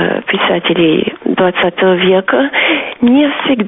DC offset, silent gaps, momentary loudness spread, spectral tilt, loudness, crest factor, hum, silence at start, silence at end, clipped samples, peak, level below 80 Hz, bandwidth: under 0.1%; none; 3 LU; -3 dB/octave; -11 LUFS; 12 dB; none; 0 s; 0 s; under 0.1%; 0 dBFS; -50 dBFS; 3.9 kHz